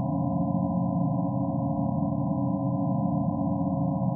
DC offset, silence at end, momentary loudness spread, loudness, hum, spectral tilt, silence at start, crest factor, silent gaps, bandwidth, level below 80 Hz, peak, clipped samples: under 0.1%; 0 s; 1 LU; -27 LUFS; none; -6 dB/octave; 0 s; 12 dB; none; 1.2 kHz; -54 dBFS; -14 dBFS; under 0.1%